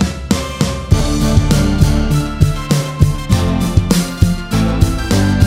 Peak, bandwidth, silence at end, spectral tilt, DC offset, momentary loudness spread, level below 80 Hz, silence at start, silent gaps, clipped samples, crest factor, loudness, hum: 0 dBFS; 16.5 kHz; 0 s; -6 dB/octave; under 0.1%; 4 LU; -20 dBFS; 0 s; none; under 0.1%; 14 dB; -15 LUFS; none